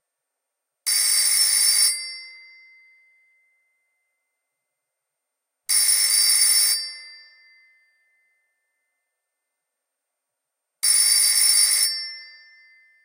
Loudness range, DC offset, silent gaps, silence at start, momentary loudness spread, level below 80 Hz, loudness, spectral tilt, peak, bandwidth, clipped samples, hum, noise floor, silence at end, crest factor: 8 LU; under 0.1%; none; 0.85 s; 19 LU; under -90 dBFS; -16 LUFS; 10.5 dB/octave; -4 dBFS; 16 kHz; under 0.1%; none; -82 dBFS; 0.8 s; 20 dB